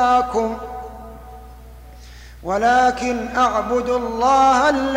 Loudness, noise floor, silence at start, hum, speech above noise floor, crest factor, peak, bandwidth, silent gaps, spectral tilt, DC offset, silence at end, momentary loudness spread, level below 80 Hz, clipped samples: -18 LUFS; -39 dBFS; 0 s; none; 22 dB; 14 dB; -6 dBFS; 16 kHz; none; -4 dB/octave; under 0.1%; 0 s; 20 LU; -40 dBFS; under 0.1%